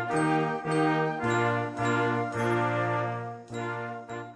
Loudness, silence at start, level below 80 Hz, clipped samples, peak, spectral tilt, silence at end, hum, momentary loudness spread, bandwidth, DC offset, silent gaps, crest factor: -28 LUFS; 0 s; -66 dBFS; under 0.1%; -16 dBFS; -6.5 dB/octave; 0 s; none; 10 LU; 11 kHz; under 0.1%; none; 14 dB